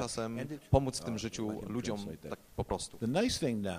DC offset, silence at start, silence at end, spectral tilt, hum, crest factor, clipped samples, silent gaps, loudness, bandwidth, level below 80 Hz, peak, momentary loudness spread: under 0.1%; 0 s; 0 s; -5 dB/octave; none; 22 dB; under 0.1%; none; -35 LUFS; 15.5 kHz; -50 dBFS; -12 dBFS; 10 LU